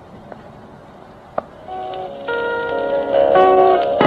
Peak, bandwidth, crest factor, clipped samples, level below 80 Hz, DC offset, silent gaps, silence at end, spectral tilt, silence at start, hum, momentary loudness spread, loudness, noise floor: 0 dBFS; 5.2 kHz; 18 dB; under 0.1%; -50 dBFS; under 0.1%; none; 0 s; -7 dB/octave; 0.1 s; none; 26 LU; -16 LUFS; -40 dBFS